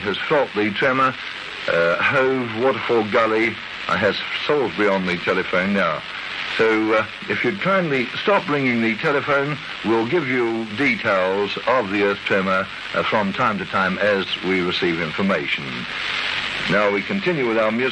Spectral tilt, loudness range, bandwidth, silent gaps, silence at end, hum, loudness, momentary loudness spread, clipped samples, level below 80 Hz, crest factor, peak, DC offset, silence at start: -5.5 dB/octave; 1 LU; 11 kHz; none; 0 s; none; -20 LUFS; 5 LU; under 0.1%; -54 dBFS; 16 dB; -6 dBFS; under 0.1%; 0 s